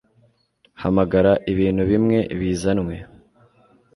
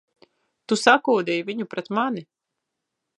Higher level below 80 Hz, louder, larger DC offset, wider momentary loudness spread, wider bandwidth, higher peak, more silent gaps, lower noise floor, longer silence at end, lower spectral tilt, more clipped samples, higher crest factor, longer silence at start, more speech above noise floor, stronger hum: first, -42 dBFS vs -78 dBFS; about the same, -20 LUFS vs -22 LUFS; neither; about the same, 10 LU vs 12 LU; about the same, 11.5 kHz vs 11.5 kHz; second, -4 dBFS vs 0 dBFS; neither; second, -61 dBFS vs -82 dBFS; about the same, 0.9 s vs 0.95 s; first, -7.5 dB/octave vs -4 dB/octave; neither; second, 18 dB vs 24 dB; about the same, 0.8 s vs 0.7 s; second, 42 dB vs 60 dB; neither